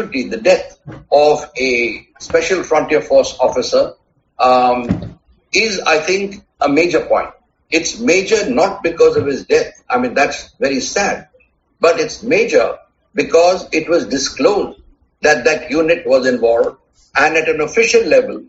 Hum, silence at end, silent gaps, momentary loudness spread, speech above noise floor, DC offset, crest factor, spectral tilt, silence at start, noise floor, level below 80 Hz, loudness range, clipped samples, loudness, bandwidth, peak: none; 0.05 s; none; 8 LU; 40 dB; under 0.1%; 14 dB; -2.5 dB/octave; 0 s; -55 dBFS; -46 dBFS; 2 LU; under 0.1%; -14 LUFS; 8 kHz; 0 dBFS